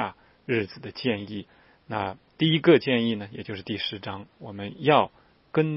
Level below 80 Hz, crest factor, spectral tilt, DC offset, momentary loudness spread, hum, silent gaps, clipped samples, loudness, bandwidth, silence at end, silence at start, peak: -66 dBFS; 22 dB; -10 dB/octave; under 0.1%; 18 LU; none; none; under 0.1%; -26 LUFS; 5.8 kHz; 0 s; 0 s; -4 dBFS